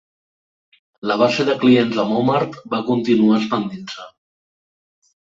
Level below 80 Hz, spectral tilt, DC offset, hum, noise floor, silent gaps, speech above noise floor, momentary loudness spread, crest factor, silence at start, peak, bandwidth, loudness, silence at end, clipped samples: -62 dBFS; -6.5 dB/octave; under 0.1%; none; under -90 dBFS; none; over 73 dB; 14 LU; 18 dB; 1.05 s; -2 dBFS; 7.6 kHz; -18 LUFS; 1.1 s; under 0.1%